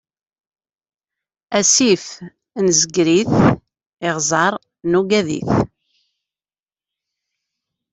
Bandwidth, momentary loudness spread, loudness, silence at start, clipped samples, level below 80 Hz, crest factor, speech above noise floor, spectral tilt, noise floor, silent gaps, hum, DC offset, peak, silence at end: 8.4 kHz; 13 LU; -16 LUFS; 1.5 s; under 0.1%; -50 dBFS; 18 dB; over 74 dB; -3.5 dB/octave; under -90 dBFS; 3.93-3.97 s; 50 Hz at -45 dBFS; under 0.1%; -2 dBFS; 2.25 s